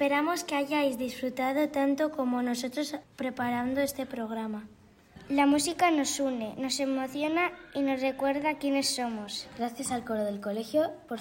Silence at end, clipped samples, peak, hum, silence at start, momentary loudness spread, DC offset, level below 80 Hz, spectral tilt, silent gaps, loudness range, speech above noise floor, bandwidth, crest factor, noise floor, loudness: 0 s; under 0.1%; -12 dBFS; none; 0 s; 9 LU; under 0.1%; -64 dBFS; -3 dB/octave; none; 3 LU; 24 dB; 16.5 kHz; 18 dB; -53 dBFS; -30 LUFS